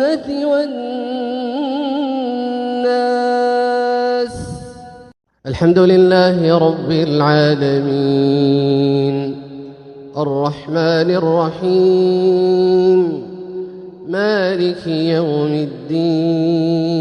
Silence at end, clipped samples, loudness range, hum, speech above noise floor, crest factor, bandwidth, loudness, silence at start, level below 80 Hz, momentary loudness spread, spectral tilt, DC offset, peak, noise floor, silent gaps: 0 s; under 0.1%; 5 LU; none; 22 dB; 14 dB; 10.5 kHz; -15 LUFS; 0 s; -52 dBFS; 14 LU; -7.5 dB/octave; under 0.1%; 0 dBFS; -36 dBFS; none